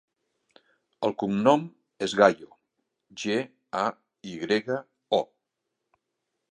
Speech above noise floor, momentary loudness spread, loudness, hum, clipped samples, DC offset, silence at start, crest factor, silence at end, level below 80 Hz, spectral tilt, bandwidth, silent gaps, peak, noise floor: 58 dB; 19 LU; -26 LUFS; none; under 0.1%; under 0.1%; 1 s; 26 dB; 1.25 s; -72 dBFS; -5 dB/octave; 10.5 kHz; none; -4 dBFS; -83 dBFS